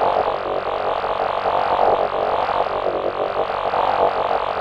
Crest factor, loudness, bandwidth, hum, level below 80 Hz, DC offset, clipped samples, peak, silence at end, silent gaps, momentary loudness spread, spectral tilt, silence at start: 16 dB; -20 LUFS; 8.8 kHz; none; -48 dBFS; under 0.1%; under 0.1%; -4 dBFS; 0 s; none; 5 LU; -5.5 dB/octave; 0 s